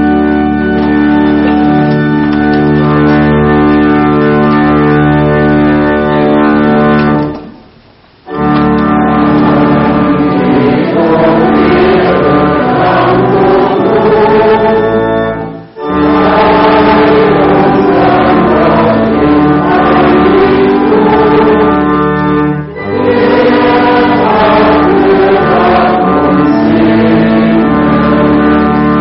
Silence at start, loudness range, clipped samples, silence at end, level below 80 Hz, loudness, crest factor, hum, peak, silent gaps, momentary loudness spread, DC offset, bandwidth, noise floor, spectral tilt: 0 s; 2 LU; under 0.1%; 0 s; -28 dBFS; -7 LUFS; 6 dB; none; 0 dBFS; none; 3 LU; under 0.1%; 5.8 kHz; -40 dBFS; -5.5 dB/octave